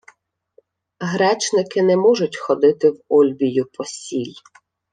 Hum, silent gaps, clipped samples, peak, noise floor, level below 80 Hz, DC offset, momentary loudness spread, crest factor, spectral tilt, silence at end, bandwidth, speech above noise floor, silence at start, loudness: none; none; under 0.1%; -4 dBFS; -57 dBFS; -68 dBFS; under 0.1%; 12 LU; 16 dB; -5 dB/octave; 0.6 s; 9.6 kHz; 40 dB; 1 s; -18 LUFS